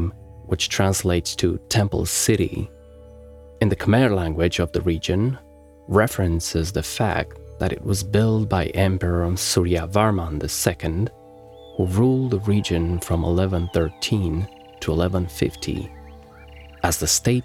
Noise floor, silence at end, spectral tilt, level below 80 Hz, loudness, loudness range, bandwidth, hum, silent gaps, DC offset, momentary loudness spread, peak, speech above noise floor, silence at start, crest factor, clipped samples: -44 dBFS; 0 s; -5 dB/octave; -40 dBFS; -22 LUFS; 2 LU; 16.5 kHz; none; none; under 0.1%; 9 LU; -2 dBFS; 23 dB; 0 s; 20 dB; under 0.1%